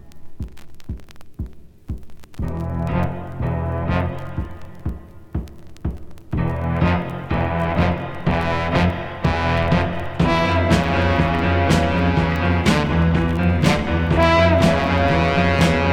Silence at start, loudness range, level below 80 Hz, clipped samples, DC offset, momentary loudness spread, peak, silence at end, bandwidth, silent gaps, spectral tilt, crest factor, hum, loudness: 0.05 s; 10 LU; -30 dBFS; under 0.1%; under 0.1%; 18 LU; -2 dBFS; 0 s; 13 kHz; none; -6.5 dB/octave; 18 dB; none; -19 LUFS